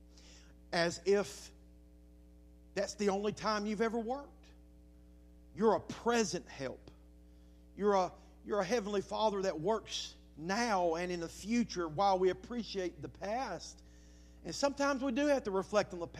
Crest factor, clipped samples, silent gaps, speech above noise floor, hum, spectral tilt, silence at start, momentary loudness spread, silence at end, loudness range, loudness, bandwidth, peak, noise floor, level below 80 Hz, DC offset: 20 dB; under 0.1%; none; 24 dB; none; -4.5 dB/octave; 0.15 s; 12 LU; 0 s; 3 LU; -35 LUFS; 14.5 kHz; -16 dBFS; -59 dBFS; -60 dBFS; under 0.1%